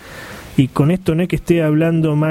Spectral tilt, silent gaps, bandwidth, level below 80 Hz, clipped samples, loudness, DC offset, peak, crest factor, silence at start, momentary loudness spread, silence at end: -8 dB/octave; none; 15.5 kHz; -40 dBFS; under 0.1%; -16 LUFS; under 0.1%; -2 dBFS; 14 dB; 0.05 s; 8 LU; 0 s